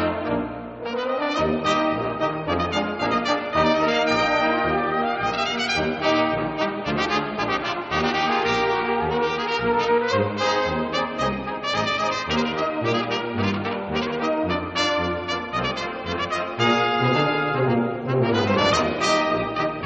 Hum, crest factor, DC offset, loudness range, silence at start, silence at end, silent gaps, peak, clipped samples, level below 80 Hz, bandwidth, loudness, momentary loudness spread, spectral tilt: none; 16 dB; under 0.1%; 3 LU; 0 s; 0 s; none; -6 dBFS; under 0.1%; -48 dBFS; 8 kHz; -22 LUFS; 6 LU; -3 dB/octave